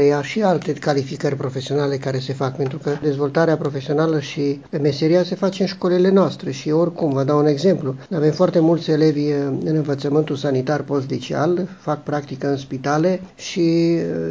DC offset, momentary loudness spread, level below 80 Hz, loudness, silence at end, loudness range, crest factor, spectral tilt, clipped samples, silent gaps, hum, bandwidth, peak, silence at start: 0.1%; 7 LU; -58 dBFS; -20 LUFS; 0 s; 3 LU; 16 dB; -7 dB/octave; under 0.1%; none; none; 7.8 kHz; -2 dBFS; 0 s